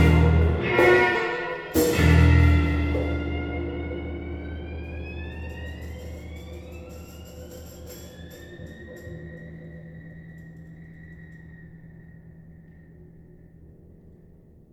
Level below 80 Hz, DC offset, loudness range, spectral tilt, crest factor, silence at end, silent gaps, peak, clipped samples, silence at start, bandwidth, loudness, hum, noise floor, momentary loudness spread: -32 dBFS; under 0.1%; 25 LU; -6.5 dB/octave; 20 dB; 1.5 s; none; -6 dBFS; under 0.1%; 0 s; 17 kHz; -23 LUFS; none; -51 dBFS; 27 LU